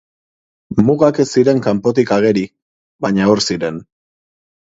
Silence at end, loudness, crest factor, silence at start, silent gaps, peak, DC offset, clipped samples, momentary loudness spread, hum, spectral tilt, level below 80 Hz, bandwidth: 0.95 s; -15 LUFS; 16 dB; 0.7 s; 2.62-2.99 s; 0 dBFS; under 0.1%; under 0.1%; 10 LU; none; -6 dB/octave; -50 dBFS; 8 kHz